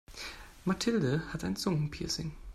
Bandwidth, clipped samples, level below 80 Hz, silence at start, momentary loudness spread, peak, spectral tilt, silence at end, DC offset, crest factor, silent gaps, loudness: 14.5 kHz; under 0.1%; -52 dBFS; 0.1 s; 13 LU; -18 dBFS; -5 dB/octave; 0 s; under 0.1%; 16 dB; none; -33 LUFS